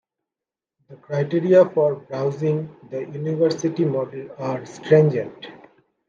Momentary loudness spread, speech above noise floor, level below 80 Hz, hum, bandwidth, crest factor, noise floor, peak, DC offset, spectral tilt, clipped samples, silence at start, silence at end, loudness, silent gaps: 16 LU; 68 dB; -70 dBFS; none; 7.4 kHz; 18 dB; -89 dBFS; -4 dBFS; under 0.1%; -7.5 dB/octave; under 0.1%; 0.9 s; 0.5 s; -21 LUFS; none